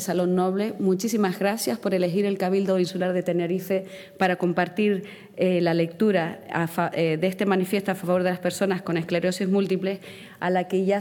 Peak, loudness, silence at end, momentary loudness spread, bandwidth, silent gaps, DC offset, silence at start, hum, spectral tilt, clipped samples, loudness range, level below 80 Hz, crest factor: -6 dBFS; -24 LUFS; 0 s; 5 LU; 18.5 kHz; none; under 0.1%; 0 s; none; -6 dB/octave; under 0.1%; 1 LU; -72 dBFS; 18 dB